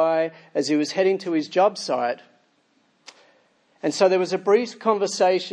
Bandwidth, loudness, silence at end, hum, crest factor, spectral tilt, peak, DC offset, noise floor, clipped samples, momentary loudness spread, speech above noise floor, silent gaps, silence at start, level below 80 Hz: 10.5 kHz; -22 LUFS; 0 s; none; 18 dB; -4 dB/octave; -6 dBFS; under 0.1%; -64 dBFS; under 0.1%; 8 LU; 43 dB; none; 0 s; -82 dBFS